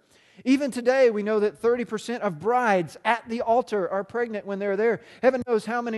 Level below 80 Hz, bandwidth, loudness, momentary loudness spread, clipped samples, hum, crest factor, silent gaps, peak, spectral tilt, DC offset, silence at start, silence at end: -66 dBFS; 12.5 kHz; -24 LUFS; 8 LU; under 0.1%; none; 18 dB; none; -6 dBFS; -5.5 dB/octave; under 0.1%; 0.4 s; 0 s